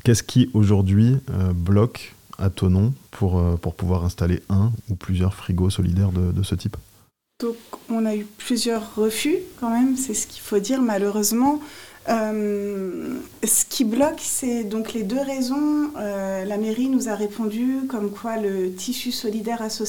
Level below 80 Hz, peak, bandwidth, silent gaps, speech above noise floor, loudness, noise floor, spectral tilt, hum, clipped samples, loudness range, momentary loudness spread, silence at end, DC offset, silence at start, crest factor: -48 dBFS; -4 dBFS; 18 kHz; none; 36 dB; -22 LUFS; -57 dBFS; -5.5 dB/octave; none; under 0.1%; 3 LU; 9 LU; 0 s; 0.2%; 0.05 s; 18 dB